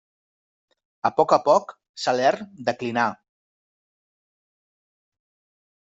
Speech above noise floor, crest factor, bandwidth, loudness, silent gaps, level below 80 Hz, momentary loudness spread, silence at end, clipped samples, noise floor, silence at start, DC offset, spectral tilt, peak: over 69 dB; 22 dB; 8 kHz; -22 LUFS; 1.89-1.94 s; -72 dBFS; 10 LU; 2.7 s; under 0.1%; under -90 dBFS; 1.05 s; under 0.1%; -4.5 dB/octave; -4 dBFS